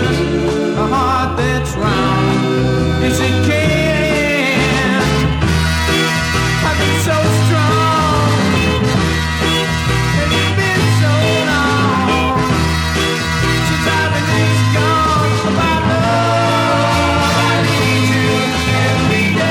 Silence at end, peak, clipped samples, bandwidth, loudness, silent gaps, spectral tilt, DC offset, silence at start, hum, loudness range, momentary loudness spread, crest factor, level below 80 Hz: 0 s; -2 dBFS; under 0.1%; 17 kHz; -14 LUFS; none; -5 dB/octave; under 0.1%; 0 s; none; 1 LU; 2 LU; 12 dB; -28 dBFS